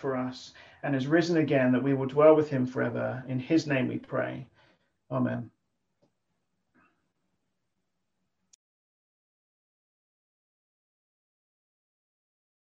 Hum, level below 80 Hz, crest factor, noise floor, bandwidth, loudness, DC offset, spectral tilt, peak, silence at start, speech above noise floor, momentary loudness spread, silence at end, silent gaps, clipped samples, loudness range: none; -72 dBFS; 22 dB; -83 dBFS; 7.6 kHz; -27 LUFS; under 0.1%; -7.5 dB/octave; -8 dBFS; 0 s; 56 dB; 16 LU; 7.15 s; none; under 0.1%; 14 LU